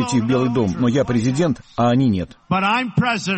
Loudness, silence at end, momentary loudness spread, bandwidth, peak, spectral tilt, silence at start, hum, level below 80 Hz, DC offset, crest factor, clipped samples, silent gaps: -19 LUFS; 0 s; 4 LU; 8.8 kHz; -6 dBFS; -6 dB/octave; 0 s; none; -46 dBFS; under 0.1%; 12 dB; under 0.1%; none